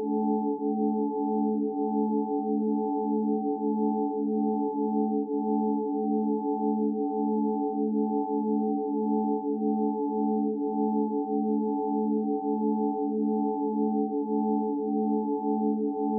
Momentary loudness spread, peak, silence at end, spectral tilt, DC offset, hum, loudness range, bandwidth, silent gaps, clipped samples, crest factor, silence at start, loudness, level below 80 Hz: 1 LU; -16 dBFS; 0 s; -0.5 dB/octave; under 0.1%; none; 0 LU; 1 kHz; none; under 0.1%; 12 dB; 0 s; -28 LUFS; -88 dBFS